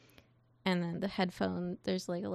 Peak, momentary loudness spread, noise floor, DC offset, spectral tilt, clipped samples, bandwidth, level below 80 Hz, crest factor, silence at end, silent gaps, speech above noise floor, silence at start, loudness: -18 dBFS; 3 LU; -65 dBFS; under 0.1%; -6 dB/octave; under 0.1%; 13 kHz; -68 dBFS; 18 dB; 0 s; none; 30 dB; 0.65 s; -36 LUFS